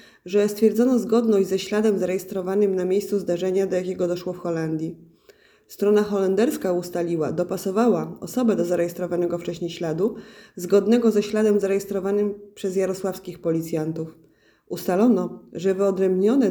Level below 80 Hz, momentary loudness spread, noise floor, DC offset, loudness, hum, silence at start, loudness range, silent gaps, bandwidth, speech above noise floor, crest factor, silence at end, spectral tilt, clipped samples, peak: -62 dBFS; 9 LU; -55 dBFS; under 0.1%; -23 LUFS; none; 0.25 s; 3 LU; none; over 20 kHz; 33 dB; 16 dB; 0 s; -6.5 dB/octave; under 0.1%; -6 dBFS